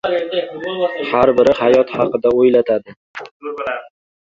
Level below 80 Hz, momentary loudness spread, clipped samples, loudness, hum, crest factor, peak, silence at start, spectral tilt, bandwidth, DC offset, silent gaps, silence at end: -52 dBFS; 17 LU; under 0.1%; -16 LUFS; none; 16 dB; 0 dBFS; 0.05 s; -6.5 dB/octave; 7.4 kHz; under 0.1%; 2.97-3.14 s, 3.31-3.40 s; 0.45 s